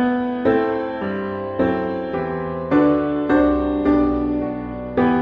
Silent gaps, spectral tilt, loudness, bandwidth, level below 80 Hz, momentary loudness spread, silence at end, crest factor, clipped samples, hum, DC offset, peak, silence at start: none; -6.5 dB/octave; -20 LUFS; 5.2 kHz; -40 dBFS; 8 LU; 0 s; 14 dB; under 0.1%; none; under 0.1%; -4 dBFS; 0 s